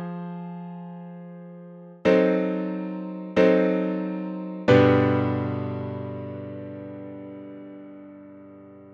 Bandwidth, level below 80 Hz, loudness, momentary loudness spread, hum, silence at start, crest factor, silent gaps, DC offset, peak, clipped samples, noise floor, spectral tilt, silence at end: 7.6 kHz; -64 dBFS; -24 LUFS; 24 LU; none; 0 s; 22 dB; none; under 0.1%; -4 dBFS; under 0.1%; -46 dBFS; -8.5 dB/octave; 0 s